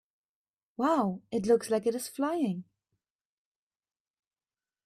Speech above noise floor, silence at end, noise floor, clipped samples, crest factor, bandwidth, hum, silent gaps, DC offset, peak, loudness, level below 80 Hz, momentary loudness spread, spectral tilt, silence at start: over 61 dB; 2.25 s; under -90 dBFS; under 0.1%; 18 dB; 14.5 kHz; none; none; under 0.1%; -14 dBFS; -30 LUFS; -74 dBFS; 7 LU; -6 dB/octave; 0.8 s